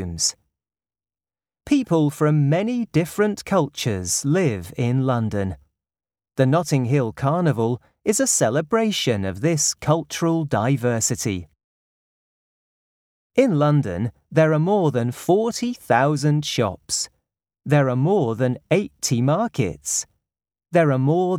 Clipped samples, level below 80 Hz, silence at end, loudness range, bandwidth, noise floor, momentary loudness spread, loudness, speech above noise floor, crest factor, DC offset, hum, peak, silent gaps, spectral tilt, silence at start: under 0.1%; -54 dBFS; 0 s; 3 LU; 16.5 kHz; under -90 dBFS; 7 LU; -21 LUFS; over 70 dB; 18 dB; under 0.1%; none; -2 dBFS; 11.64-13.30 s; -5 dB/octave; 0 s